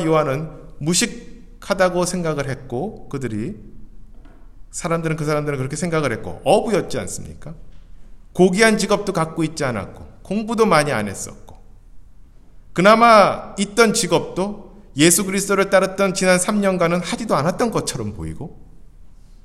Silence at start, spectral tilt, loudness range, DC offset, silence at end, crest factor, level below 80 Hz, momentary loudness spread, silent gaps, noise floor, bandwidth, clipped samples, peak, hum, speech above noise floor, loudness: 0 s; -4.5 dB/octave; 8 LU; under 0.1%; 0.1 s; 20 dB; -42 dBFS; 17 LU; none; -43 dBFS; 15.5 kHz; under 0.1%; 0 dBFS; none; 24 dB; -18 LUFS